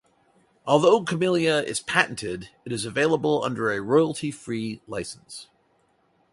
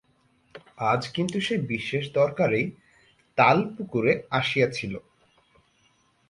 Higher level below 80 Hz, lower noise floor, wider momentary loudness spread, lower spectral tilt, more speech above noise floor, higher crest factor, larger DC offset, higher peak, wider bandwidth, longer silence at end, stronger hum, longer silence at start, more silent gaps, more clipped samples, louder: about the same, -62 dBFS vs -62 dBFS; about the same, -66 dBFS vs -65 dBFS; first, 16 LU vs 12 LU; second, -4.5 dB/octave vs -6 dB/octave; about the same, 42 dB vs 41 dB; about the same, 22 dB vs 22 dB; neither; about the same, -2 dBFS vs -4 dBFS; about the same, 11.5 kHz vs 11.5 kHz; second, 0.9 s vs 1.3 s; neither; about the same, 0.65 s vs 0.55 s; neither; neither; about the same, -24 LUFS vs -25 LUFS